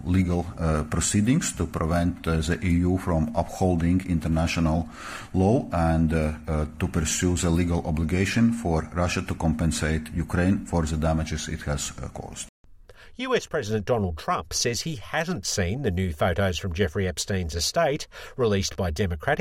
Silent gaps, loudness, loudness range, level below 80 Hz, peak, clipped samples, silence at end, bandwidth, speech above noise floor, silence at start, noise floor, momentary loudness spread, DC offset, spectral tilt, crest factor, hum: 12.49-12.64 s; -25 LUFS; 4 LU; -40 dBFS; -10 dBFS; under 0.1%; 0 s; 16 kHz; 23 dB; 0 s; -48 dBFS; 7 LU; under 0.1%; -5 dB/octave; 16 dB; none